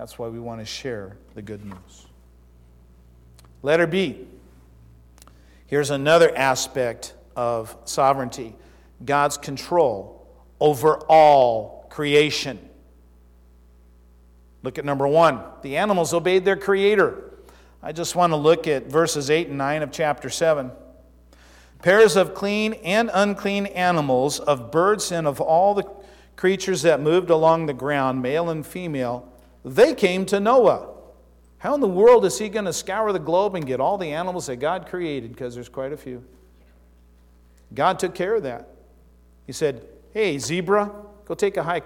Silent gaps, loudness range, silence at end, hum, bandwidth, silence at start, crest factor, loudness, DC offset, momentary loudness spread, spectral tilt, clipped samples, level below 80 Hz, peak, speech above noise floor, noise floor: none; 9 LU; 0 s; 60 Hz at -50 dBFS; 16.5 kHz; 0 s; 16 dB; -21 LUFS; under 0.1%; 18 LU; -4.5 dB/octave; under 0.1%; -52 dBFS; -6 dBFS; 32 dB; -52 dBFS